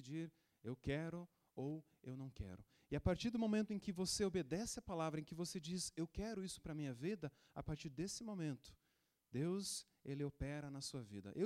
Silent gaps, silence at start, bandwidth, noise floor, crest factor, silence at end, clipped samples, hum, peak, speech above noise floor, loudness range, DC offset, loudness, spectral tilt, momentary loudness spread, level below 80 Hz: none; 0 s; 16 kHz; -84 dBFS; 20 dB; 0 s; under 0.1%; none; -26 dBFS; 39 dB; 5 LU; under 0.1%; -46 LUFS; -5 dB/octave; 12 LU; -62 dBFS